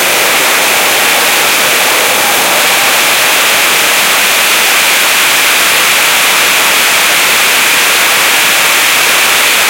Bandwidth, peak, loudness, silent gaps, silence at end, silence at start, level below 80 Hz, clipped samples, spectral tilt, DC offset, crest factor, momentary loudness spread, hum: over 20 kHz; 0 dBFS; -6 LUFS; none; 0 s; 0 s; -52 dBFS; 0.3%; 1 dB/octave; under 0.1%; 8 dB; 1 LU; none